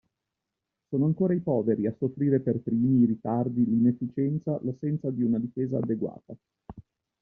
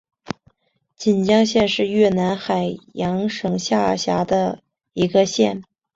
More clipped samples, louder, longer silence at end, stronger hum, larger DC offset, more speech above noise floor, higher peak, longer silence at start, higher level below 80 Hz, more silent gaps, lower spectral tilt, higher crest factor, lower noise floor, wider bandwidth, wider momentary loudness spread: neither; second, -27 LUFS vs -19 LUFS; about the same, 0.4 s vs 0.35 s; neither; neither; first, 59 dB vs 49 dB; second, -12 dBFS vs -2 dBFS; first, 0.9 s vs 0.3 s; second, -64 dBFS vs -54 dBFS; neither; first, -13 dB/octave vs -5.5 dB/octave; about the same, 16 dB vs 18 dB; first, -86 dBFS vs -68 dBFS; second, 2.5 kHz vs 7.8 kHz; second, 7 LU vs 17 LU